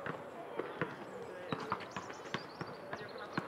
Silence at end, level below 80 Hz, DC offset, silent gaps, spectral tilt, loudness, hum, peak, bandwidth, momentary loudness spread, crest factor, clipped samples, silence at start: 0 s; -78 dBFS; under 0.1%; none; -5.5 dB/octave; -44 LUFS; none; -20 dBFS; 16 kHz; 6 LU; 24 dB; under 0.1%; 0 s